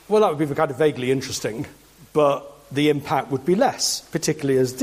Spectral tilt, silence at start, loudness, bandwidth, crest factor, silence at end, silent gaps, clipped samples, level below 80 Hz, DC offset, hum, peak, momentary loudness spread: -4.5 dB/octave; 0.1 s; -22 LUFS; 15.5 kHz; 16 dB; 0 s; none; under 0.1%; -58 dBFS; under 0.1%; none; -6 dBFS; 9 LU